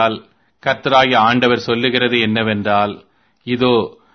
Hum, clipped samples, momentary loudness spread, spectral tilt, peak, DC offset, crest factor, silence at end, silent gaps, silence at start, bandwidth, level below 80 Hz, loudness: none; under 0.1%; 11 LU; -6 dB/octave; 0 dBFS; under 0.1%; 16 dB; 0.25 s; none; 0 s; 6.6 kHz; -54 dBFS; -15 LUFS